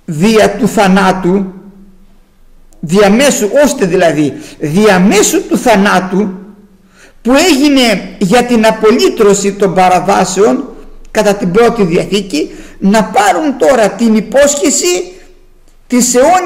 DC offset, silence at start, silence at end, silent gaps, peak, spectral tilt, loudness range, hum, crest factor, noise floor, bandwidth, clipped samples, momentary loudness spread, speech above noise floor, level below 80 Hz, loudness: under 0.1%; 0.1 s; 0 s; none; 0 dBFS; -4.5 dB/octave; 3 LU; none; 10 dB; -41 dBFS; 16.5 kHz; under 0.1%; 9 LU; 32 dB; -36 dBFS; -9 LUFS